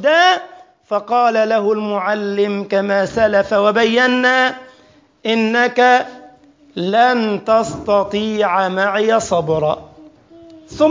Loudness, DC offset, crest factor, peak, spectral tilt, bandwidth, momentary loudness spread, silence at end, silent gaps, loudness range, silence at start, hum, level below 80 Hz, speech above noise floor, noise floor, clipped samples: -15 LUFS; under 0.1%; 14 dB; -2 dBFS; -4.5 dB/octave; 7.6 kHz; 8 LU; 0 s; none; 2 LU; 0 s; none; -52 dBFS; 35 dB; -50 dBFS; under 0.1%